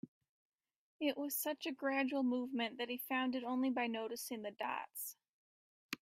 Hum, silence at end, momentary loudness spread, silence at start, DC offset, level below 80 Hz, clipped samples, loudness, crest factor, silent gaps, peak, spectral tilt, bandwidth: none; 0.1 s; 9 LU; 0.05 s; under 0.1%; -88 dBFS; under 0.1%; -40 LUFS; 18 dB; 0.08-0.21 s, 0.29-0.52 s, 0.78-0.99 s, 5.29-5.89 s; -22 dBFS; -2.5 dB/octave; 16 kHz